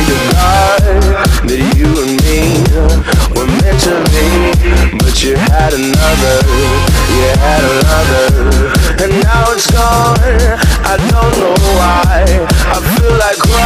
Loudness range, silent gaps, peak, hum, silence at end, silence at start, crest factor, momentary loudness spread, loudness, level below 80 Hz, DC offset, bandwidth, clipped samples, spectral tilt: 1 LU; none; 0 dBFS; none; 0 s; 0 s; 8 dB; 2 LU; -9 LUFS; -12 dBFS; under 0.1%; 16 kHz; 0.2%; -5 dB/octave